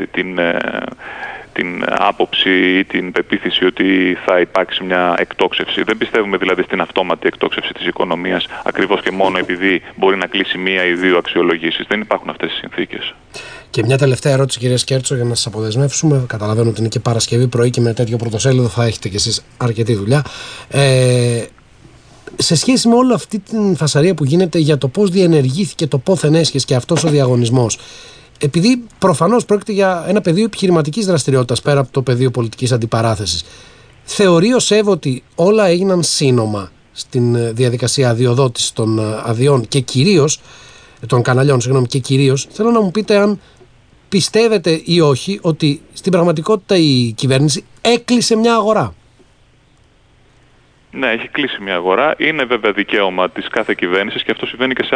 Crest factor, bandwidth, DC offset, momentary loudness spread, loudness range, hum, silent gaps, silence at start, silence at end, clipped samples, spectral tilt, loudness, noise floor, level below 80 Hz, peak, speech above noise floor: 14 dB; 11 kHz; under 0.1%; 8 LU; 3 LU; none; none; 0 s; 0 s; under 0.1%; -5 dB/octave; -14 LUFS; -50 dBFS; -48 dBFS; 0 dBFS; 36 dB